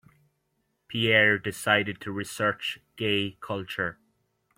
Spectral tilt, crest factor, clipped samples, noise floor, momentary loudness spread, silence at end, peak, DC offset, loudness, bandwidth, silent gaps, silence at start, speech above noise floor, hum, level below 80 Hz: -4 dB/octave; 22 dB; under 0.1%; -75 dBFS; 14 LU; 0.65 s; -6 dBFS; under 0.1%; -26 LUFS; 16.5 kHz; none; 0.9 s; 48 dB; none; -64 dBFS